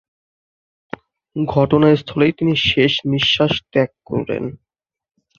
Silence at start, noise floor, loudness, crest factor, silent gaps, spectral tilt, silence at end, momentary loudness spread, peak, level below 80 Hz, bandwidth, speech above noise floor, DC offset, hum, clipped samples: 1.35 s; under -90 dBFS; -17 LUFS; 18 dB; none; -6.5 dB/octave; 0.85 s; 18 LU; -2 dBFS; -48 dBFS; 7.2 kHz; over 73 dB; under 0.1%; none; under 0.1%